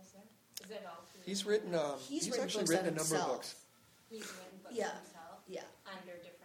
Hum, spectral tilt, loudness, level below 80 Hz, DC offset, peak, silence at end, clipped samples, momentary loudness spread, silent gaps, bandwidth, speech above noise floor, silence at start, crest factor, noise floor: none; -3.5 dB/octave; -38 LUFS; -82 dBFS; under 0.1%; -20 dBFS; 0 s; under 0.1%; 18 LU; none; 19 kHz; 26 dB; 0 s; 20 dB; -64 dBFS